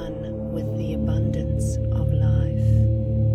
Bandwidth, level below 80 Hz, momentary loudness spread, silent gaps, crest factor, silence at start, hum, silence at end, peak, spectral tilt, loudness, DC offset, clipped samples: 9.6 kHz; -30 dBFS; 8 LU; none; 12 dB; 0 s; none; 0 s; -10 dBFS; -9 dB/octave; -23 LUFS; under 0.1%; under 0.1%